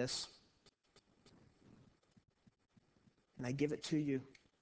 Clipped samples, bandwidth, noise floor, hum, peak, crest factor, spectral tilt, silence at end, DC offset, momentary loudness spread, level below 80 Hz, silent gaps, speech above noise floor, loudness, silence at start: under 0.1%; 8 kHz; -74 dBFS; none; -24 dBFS; 20 dB; -5 dB/octave; 0.3 s; under 0.1%; 11 LU; -76 dBFS; none; 34 dB; -41 LUFS; 0 s